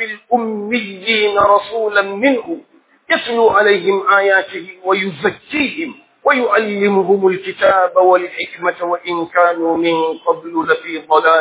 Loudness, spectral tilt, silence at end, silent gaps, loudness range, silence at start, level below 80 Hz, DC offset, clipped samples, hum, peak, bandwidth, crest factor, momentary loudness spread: -15 LUFS; -8.5 dB/octave; 0 s; none; 2 LU; 0 s; -58 dBFS; under 0.1%; under 0.1%; none; 0 dBFS; 4 kHz; 14 dB; 8 LU